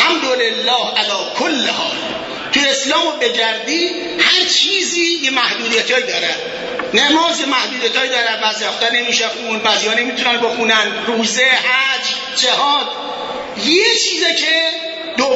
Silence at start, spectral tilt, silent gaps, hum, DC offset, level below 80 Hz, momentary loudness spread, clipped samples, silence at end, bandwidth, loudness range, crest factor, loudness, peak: 0 s; -0.5 dB/octave; none; none; under 0.1%; -58 dBFS; 7 LU; under 0.1%; 0 s; 8 kHz; 2 LU; 16 dB; -14 LUFS; 0 dBFS